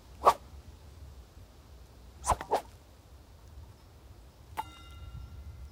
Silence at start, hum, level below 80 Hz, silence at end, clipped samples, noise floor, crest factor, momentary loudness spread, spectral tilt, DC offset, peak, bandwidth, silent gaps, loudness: 0 s; none; -50 dBFS; 0 s; under 0.1%; -54 dBFS; 28 dB; 26 LU; -4 dB/octave; under 0.1%; -8 dBFS; 16 kHz; none; -33 LUFS